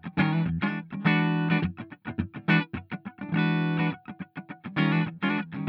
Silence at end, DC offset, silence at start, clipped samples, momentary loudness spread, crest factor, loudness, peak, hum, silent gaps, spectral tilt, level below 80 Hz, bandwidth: 0 s; under 0.1%; 0.05 s; under 0.1%; 15 LU; 16 dB; -27 LUFS; -10 dBFS; none; none; -9.5 dB/octave; -58 dBFS; 5.2 kHz